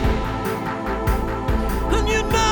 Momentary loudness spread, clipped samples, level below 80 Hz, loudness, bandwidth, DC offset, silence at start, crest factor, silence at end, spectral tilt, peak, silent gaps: 5 LU; under 0.1%; -24 dBFS; -22 LUFS; over 20 kHz; under 0.1%; 0 s; 14 dB; 0 s; -5 dB/octave; -6 dBFS; none